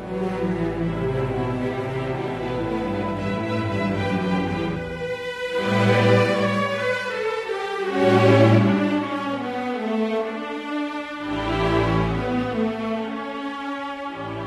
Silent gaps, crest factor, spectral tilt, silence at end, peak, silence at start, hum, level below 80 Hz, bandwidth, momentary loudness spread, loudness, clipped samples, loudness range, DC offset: none; 20 dB; -7 dB/octave; 0 s; -2 dBFS; 0 s; none; -42 dBFS; 12.5 kHz; 12 LU; -23 LUFS; under 0.1%; 6 LU; under 0.1%